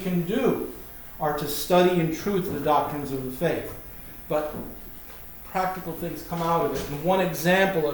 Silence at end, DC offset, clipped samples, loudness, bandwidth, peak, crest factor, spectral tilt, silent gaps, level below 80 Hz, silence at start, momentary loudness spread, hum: 0 s; under 0.1%; under 0.1%; -25 LUFS; over 20 kHz; -8 dBFS; 18 dB; -5.5 dB/octave; none; -48 dBFS; 0 s; 17 LU; none